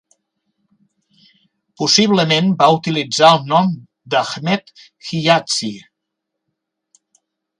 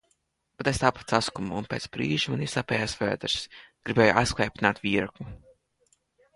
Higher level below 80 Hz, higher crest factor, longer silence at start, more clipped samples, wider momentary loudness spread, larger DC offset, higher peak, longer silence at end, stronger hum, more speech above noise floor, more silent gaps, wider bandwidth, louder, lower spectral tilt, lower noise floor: second, -62 dBFS vs -50 dBFS; second, 18 dB vs 24 dB; first, 1.8 s vs 0.6 s; neither; about the same, 14 LU vs 12 LU; neither; first, 0 dBFS vs -4 dBFS; first, 1.8 s vs 1 s; neither; first, 63 dB vs 46 dB; neither; about the same, 11.5 kHz vs 11.5 kHz; first, -15 LUFS vs -26 LUFS; about the same, -4 dB/octave vs -4.5 dB/octave; first, -78 dBFS vs -73 dBFS